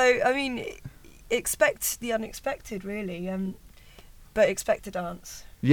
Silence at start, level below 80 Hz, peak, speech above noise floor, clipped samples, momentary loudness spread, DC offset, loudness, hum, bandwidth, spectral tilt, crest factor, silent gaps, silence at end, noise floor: 0 s; -52 dBFS; -8 dBFS; 22 dB; under 0.1%; 16 LU; under 0.1%; -28 LUFS; none; over 20 kHz; -4 dB/octave; 20 dB; none; 0 s; -50 dBFS